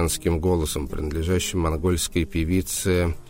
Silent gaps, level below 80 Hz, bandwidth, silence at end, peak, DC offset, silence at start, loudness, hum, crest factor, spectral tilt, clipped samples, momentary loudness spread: none; -32 dBFS; 16.5 kHz; 0 s; -10 dBFS; under 0.1%; 0 s; -24 LUFS; none; 14 dB; -5 dB/octave; under 0.1%; 5 LU